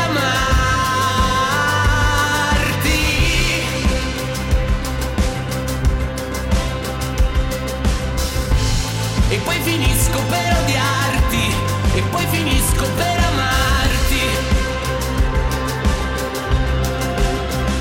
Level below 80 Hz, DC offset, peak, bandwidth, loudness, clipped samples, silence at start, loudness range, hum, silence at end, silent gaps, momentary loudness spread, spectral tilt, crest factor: -22 dBFS; under 0.1%; -6 dBFS; 17 kHz; -18 LUFS; under 0.1%; 0 s; 4 LU; none; 0 s; none; 5 LU; -4 dB/octave; 12 dB